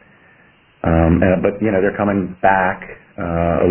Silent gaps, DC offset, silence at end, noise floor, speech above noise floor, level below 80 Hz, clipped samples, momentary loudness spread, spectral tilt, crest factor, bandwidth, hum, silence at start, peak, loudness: none; under 0.1%; 0 s; -51 dBFS; 35 dB; -34 dBFS; under 0.1%; 11 LU; -12 dB/octave; 16 dB; 3.3 kHz; none; 0.85 s; 0 dBFS; -17 LUFS